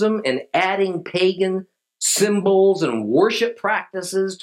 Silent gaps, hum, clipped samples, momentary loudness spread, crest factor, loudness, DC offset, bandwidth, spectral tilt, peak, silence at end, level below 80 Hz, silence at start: none; none; under 0.1%; 7 LU; 16 dB; -19 LUFS; under 0.1%; 16 kHz; -3.5 dB/octave; -4 dBFS; 0.05 s; -76 dBFS; 0 s